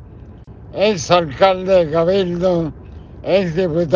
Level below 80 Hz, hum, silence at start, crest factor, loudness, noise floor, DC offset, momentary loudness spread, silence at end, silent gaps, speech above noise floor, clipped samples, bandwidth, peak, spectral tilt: -42 dBFS; none; 0 s; 16 dB; -16 LUFS; -37 dBFS; under 0.1%; 13 LU; 0 s; none; 22 dB; under 0.1%; 7.4 kHz; 0 dBFS; -5.5 dB/octave